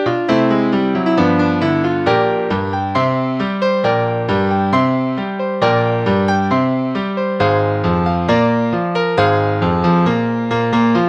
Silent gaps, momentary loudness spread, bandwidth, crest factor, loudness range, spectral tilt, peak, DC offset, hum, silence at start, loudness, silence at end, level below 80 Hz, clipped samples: none; 4 LU; 8 kHz; 14 dB; 1 LU; -8 dB/octave; 0 dBFS; under 0.1%; none; 0 s; -16 LUFS; 0 s; -44 dBFS; under 0.1%